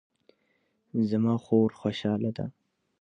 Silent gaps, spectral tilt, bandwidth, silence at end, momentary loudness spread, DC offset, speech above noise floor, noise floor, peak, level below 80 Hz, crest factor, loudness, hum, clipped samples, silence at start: none; -8.5 dB/octave; 7.2 kHz; 0.5 s; 11 LU; under 0.1%; 46 dB; -73 dBFS; -12 dBFS; -64 dBFS; 18 dB; -28 LUFS; none; under 0.1%; 0.95 s